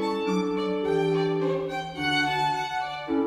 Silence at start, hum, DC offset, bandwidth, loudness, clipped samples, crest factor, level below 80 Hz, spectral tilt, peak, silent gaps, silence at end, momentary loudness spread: 0 s; none; under 0.1%; 15 kHz; -26 LUFS; under 0.1%; 12 dB; -58 dBFS; -5.5 dB/octave; -14 dBFS; none; 0 s; 6 LU